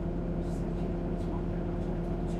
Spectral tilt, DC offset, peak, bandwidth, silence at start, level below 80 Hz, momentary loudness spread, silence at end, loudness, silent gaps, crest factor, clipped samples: -9 dB/octave; under 0.1%; -20 dBFS; 9.4 kHz; 0 s; -38 dBFS; 0 LU; 0 s; -34 LUFS; none; 12 dB; under 0.1%